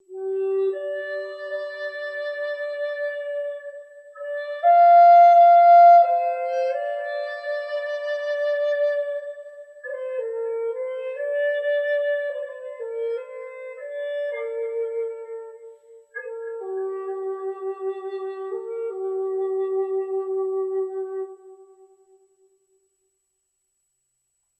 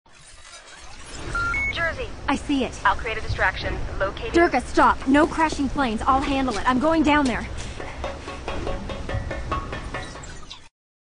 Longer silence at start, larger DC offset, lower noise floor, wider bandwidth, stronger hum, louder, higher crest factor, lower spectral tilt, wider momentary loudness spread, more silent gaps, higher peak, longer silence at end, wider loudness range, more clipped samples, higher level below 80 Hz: about the same, 0.1 s vs 0.15 s; neither; first, -74 dBFS vs -45 dBFS; second, 5.6 kHz vs 10 kHz; neither; about the same, -22 LUFS vs -23 LUFS; about the same, 16 dB vs 18 dB; second, -2.5 dB/octave vs -5 dB/octave; about the same, 22 LU vs 20 LU; neither; about the same, -6 dBFS vs -6 dBFS; first, 2.95 s vs 0.45 s; first, 16 LU vs 9 LU; neither; second, under -90 dBFS vs -36 dBFS